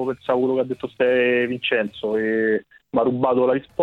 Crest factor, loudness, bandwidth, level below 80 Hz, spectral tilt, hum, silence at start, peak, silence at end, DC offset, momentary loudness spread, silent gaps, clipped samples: 16 dB; -21 LUFS; 4.6 kHz; -62 dBFS; -7.5 dB/octave; none; 0 s; -6 dBFS; 0 s; under 0.1%; 6 LU; none; under 0.1%